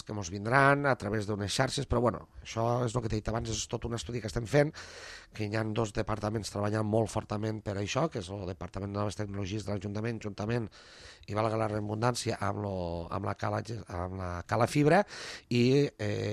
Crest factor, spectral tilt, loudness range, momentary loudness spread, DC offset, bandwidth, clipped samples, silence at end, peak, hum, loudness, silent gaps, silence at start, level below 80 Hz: 22 dB; -5.5 dB/octave; 5 LU; 13 LU; under 0.1%; 13 kHz; under 0.1%; 0 s; -8 dBFS; none; -32 LUFS; none; 0.05 s; -52 dBFS